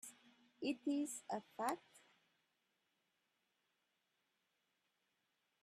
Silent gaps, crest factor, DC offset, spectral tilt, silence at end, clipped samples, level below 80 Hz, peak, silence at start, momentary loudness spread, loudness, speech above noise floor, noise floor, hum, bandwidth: none; 24 dB; under 0.1%; -3.5 dB/octave; 3.65 s; under 0.1%; under -90 dBFS; -26 dBFS; 0.05 s; 8 LU; -44 LUFS; 42 dB; -86 dBFS; none; 14.5 kHz